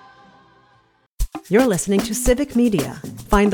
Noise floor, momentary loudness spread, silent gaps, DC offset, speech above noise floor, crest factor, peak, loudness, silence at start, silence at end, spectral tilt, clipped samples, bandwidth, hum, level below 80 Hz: -58 dBFS; 14 LU; none; under 0.1%; 41 dB; 18 dB; -2 dBFS; -19 LUFS; 1.2 s; 0 s; -5 dB/octave; under 0.1%; 19.5 kHz; none; -32 dBFS